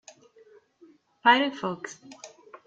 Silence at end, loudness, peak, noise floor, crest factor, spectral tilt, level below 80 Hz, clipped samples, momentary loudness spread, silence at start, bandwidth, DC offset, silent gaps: 0.4 s; -24 LUFS; -4 dBFS; -58 dBFS; 24 dB; -3.5 dB/octave; -78 dBFS; under 0.1%; 26 LU; 1.25 s; 8 kHz; under 0.1%; none